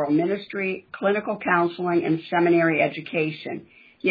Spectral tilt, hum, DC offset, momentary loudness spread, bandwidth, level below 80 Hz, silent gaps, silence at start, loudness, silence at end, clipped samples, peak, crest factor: -9.5 dB/octave; none; under 0.1%; 9 LU; 5 kHz; -70 dBFS; none; 0 s; -23 LUFS; 0 s; under 0.1%; -6 dBFS; 16 dB